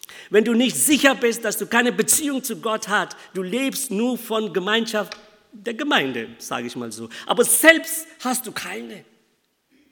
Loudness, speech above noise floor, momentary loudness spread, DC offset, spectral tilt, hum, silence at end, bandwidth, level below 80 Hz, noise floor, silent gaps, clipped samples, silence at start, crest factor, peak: -20 LUFS; 46 dB; 16 LU; under 0.1%; -2 dB/octave; none; 0.9 s; 19 kHz; -68 dBFS; -67 dBFS; none; under 0.1%; 0.1 s; 22 dB; 0 dBFS